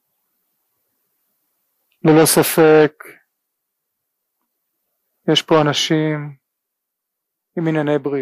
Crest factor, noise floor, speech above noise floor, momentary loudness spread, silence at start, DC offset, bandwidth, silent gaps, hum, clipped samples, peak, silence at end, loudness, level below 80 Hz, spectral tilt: 16 dB; -79 dBFS; 65 dB; 14 LU; 2.05 s; under 0.1%; 15.5 kHz; none; none; under 0.1%; -4 dBFS; 0 s; -15 LUFS; -60 dBFS; -4.5 dB/octave